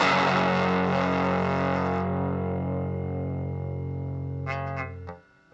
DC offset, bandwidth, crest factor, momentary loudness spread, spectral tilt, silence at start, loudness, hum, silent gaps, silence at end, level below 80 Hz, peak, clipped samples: under 0.1%; 8 kHz; 16 dB; 10 LU; -7 dB/octave; 0 s; -27 LUFS; none; none; 0.35 s; -62 dBFS; -10 dBFS; under 0.1%